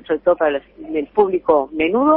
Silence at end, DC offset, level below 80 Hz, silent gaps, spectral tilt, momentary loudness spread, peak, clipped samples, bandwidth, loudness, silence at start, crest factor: 0 s; under 0.1%; -52 dBFS; none; -10.5 dB/octave; 9 LU; -2 dBFS; under 0.1%; 4 kHz; -18 LUFS; 0.1 s; 16 dB